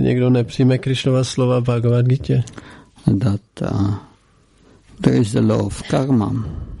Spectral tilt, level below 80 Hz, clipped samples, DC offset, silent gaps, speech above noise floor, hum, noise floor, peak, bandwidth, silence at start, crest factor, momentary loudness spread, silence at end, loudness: -7.5 dB/octave; -42 dBFS; under 0.1%; under 0.1%; none; 37 dB; none; -54 dBFS; -2 dBFS; 11.5 kHz; 0 s; 16 dB; 7 LU; 0 s; -18 LUFS